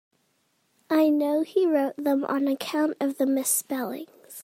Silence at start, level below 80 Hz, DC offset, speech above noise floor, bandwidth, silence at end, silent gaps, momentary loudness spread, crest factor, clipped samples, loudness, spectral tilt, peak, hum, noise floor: 0.9 s; -82 dBFS; under 0.1%; 46 dB; 16 kHz; 0 s; none; 9 LU; 14 dB; under 0.1%; -25 LUFS; -3 dB/octave; -10 dBFS; none; -70 dBFS